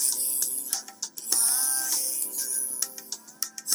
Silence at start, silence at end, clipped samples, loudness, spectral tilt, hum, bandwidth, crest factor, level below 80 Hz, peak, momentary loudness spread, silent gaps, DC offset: 0 s; 0 s; under 0.1%; -25 LUFS; 2.5 dB/octave; none; over 20 kHz; 26 dB; under -90 dBFS; -2 dBFS; 13 LU; none; under 0.1%